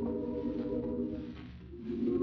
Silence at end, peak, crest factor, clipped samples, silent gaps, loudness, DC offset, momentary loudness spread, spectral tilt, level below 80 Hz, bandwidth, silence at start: 0 s; -22 dBFS; 14 dB; under 0.1%; none; -37 LUFS; under 0.1%; 11 LU; -8.5 dB/octave; -54 dBFS; 5.8 kHz; 0 s